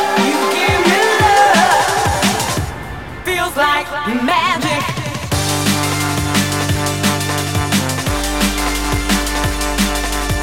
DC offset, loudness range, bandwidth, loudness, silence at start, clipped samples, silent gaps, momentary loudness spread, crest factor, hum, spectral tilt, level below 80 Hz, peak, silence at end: 0.8%; 3 LU; 16.5 kHz; -15 LUFS; 0 s; under 0.1%; none; 8 LU; 16 dB; none; -3.5 dB/octave; -28 dBFS; 0 dBFS; 0 s